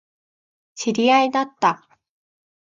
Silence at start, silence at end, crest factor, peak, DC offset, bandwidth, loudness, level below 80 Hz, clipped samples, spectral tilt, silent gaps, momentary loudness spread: 0.75 s; 0.85 s; 18 dB; -4 dBFS; under 0.1%; 7.6 kHz; -19 LUFS; -72 dBFS; under 0.1%; -3.5 dB/octave; none; 11 LU